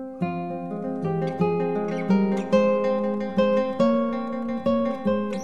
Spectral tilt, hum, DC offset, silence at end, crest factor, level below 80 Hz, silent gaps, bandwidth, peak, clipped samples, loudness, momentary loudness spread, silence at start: -8 dB/octave; none; 0.6%; 0 s; 16 dB; -62 dBFS; none; 8.4 kHz; -8 dBFS; under 0.1%; -24 LUFS; 8 LU; 0 s